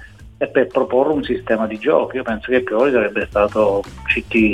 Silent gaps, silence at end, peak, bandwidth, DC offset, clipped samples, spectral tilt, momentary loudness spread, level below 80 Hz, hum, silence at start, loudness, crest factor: none; 0 s; -2 dBFS; 10 kHz; 0.2%; under 0.1%; -7 dB/octave; 5 LU; -42 dBFS; none; 0 s; -18 LUFS; 16 dB